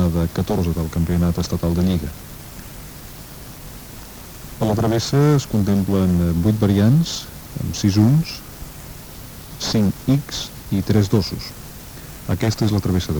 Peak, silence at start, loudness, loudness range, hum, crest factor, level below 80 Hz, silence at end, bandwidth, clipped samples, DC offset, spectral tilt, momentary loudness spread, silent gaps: -4 dBFS; 0 s; -19 LUFS; 7 LU; none; 16 dB; -38 dBFS; 0 s; over 20 kHz; under 0.1%; under 0.1%; -6.5 dB/octave; 19 LU; none